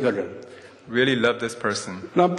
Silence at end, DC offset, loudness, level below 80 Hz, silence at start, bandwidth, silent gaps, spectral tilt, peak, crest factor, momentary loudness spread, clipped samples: 0 s; under 0.1%; -24 LUFS; -66 dBFS; 0 s; 12 kHz; none; -4.5 dB/octave; -4 dBFS; 18 dB; 16 LU; under 0.1%